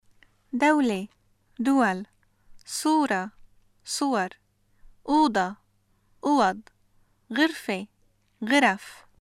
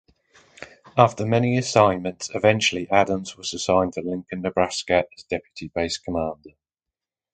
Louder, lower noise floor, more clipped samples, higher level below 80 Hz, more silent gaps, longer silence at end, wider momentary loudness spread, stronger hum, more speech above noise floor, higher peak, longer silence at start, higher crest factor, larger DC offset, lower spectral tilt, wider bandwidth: second, -25 LUFS vs -22 LUFS; second, -66 dBFS vs -89 dBFS; neither; second, -62 dBFS vs -50 dBFS; neither; second, 0.25 s vs 0.85 s; first, 18 LU vs 12 LU; neither; second, 42 dB vs 66 dB; second, -6 dBFS vs 0 dBFS; about the same, 0.55 s vs 0.6 s; about the same, 20 dB vs 22 dB; neither; about the same, -4 dB/octave vs -4.5 dB/octave; first, 15 kHz vs 9.4 kHz